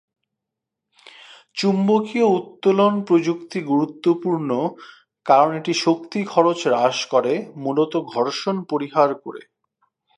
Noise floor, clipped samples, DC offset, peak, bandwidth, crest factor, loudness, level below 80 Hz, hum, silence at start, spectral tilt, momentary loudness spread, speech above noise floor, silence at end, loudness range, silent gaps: -83 dBFS; under 0.1%; under 0.1%; -2 dBFS; 11 kHz; 20 dB; -20 LUFS; -76 dBFS; none; 1.55 s; -5.5 dB/octave; 8 LU; 64 dB; 0.8 s; 2 LU; none